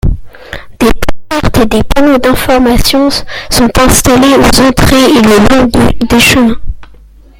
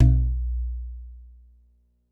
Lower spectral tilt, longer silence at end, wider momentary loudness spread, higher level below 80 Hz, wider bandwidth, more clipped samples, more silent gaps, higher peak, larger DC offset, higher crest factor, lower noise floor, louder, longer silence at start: second, -4.5 dB/octave vs -10.5 dB/octave; second, 0.55 s vs 0.85 s; second, 12 LU vs 23 LU; first, -18 dBFS vs -26 dBFS; first, over 20 kHz vs 1.6 kHz; first, 2% vs under 0.1%; neither; first, 0 dBFS vs -6 dBFS; neither; second, 6 dB vs 18 dB; second, -35 dBFS vs -62 dBFS; first, -7 LUFS vs -26 LUFS; about the same, 0.05 s vs 0 s